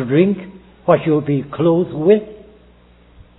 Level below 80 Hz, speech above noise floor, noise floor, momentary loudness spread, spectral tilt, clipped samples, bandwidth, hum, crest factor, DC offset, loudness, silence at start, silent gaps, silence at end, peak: -50 dBFS; 33 dB; -48 dBFS; 11 LU; -12 dB/octave; under 0.1%; 4.1 kHz; 60 Hz at -45 dBFS; 18 dB; under 0.1%; -16 LUFS; 0 s; none; 1 s; 0 dBFS